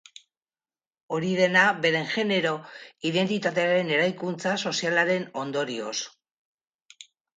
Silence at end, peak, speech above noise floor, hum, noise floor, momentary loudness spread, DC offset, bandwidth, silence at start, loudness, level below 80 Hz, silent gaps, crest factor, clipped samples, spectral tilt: 0.35 s; -6 dBFS; over 65 dB; none; under -90 dBFS; 12 LU; under 0.1%; 9.4 kHz; 1.1 s; -25 LUFS; -74 dBFS; 6.32-6.58 s, 6.75-6.79 s; 20 dB; under 0.1%; -4 dB/octave